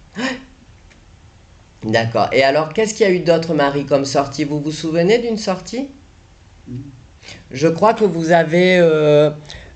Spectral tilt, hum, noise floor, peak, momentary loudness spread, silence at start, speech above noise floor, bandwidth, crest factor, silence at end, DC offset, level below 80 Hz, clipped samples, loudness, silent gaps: -5.5 dB/octave; none; -46 dBFS; -2 dBFS; 18 LU; 0.15 s; 31 dB; 9 kHz; 16 dB; 0.1 s; under 0.1%; -48 dBFS; under 0.1%; -16 LUFS; none